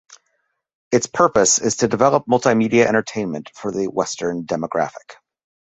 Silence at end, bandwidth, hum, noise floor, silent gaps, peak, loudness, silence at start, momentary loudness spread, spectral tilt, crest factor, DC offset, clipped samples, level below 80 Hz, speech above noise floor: 0.55 s; 8.4 kHz; none; -70 dBFS; 0.75-0.91 s; 0 dBFS; -18 LUFS; 0.1 s; 11 LU; -4 dB/octave; 18 dB; under 0.1%; under 0.1%; -56 dBFS; 52 dB